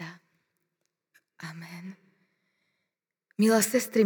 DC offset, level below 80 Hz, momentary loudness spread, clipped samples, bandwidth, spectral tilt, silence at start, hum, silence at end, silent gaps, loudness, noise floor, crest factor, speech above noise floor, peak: under 0.1%; -84 dBFS; 21 LU; under 0.1%; over 20 kHz; -4 dB/octave; 0 s; none; 0 s; none; -24 LUFS; -86 dBFS; 20 dB; 60 dB; -10 dBFS